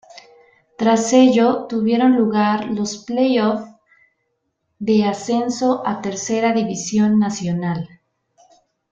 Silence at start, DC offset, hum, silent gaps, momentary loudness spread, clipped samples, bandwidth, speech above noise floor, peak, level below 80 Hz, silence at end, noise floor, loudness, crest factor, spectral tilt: 0.15 s; under 0.1%; none; none; 10 LU; under 0.1%; 8.8 kHz; 55 dB; -2 dBFS; -60 dBFS; 1.05 s; -72 dBFS; -18 LUFS; 16 dB; -5.5 dB/octave